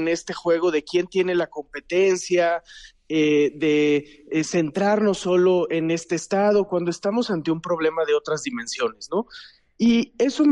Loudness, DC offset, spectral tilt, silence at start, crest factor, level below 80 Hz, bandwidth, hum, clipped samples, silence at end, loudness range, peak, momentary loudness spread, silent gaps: -22 LUFS; under 0.1%; -5 dB/octave; 0 s; 14 dB; -62 dBFS; 11 kHz; none; under 0.1%; 0 s; 3 LU; -8 dBFS; 8 LU; none